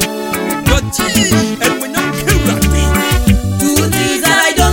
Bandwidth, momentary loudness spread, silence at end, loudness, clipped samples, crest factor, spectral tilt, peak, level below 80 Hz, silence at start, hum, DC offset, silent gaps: 17 kHz; 6 LU; 0 s; -12 LUFS; under 0.1%; 12 dB; -4 dB/octave; 0 dBFS; -20 dBFS; 0 s; none; under 0.1%; none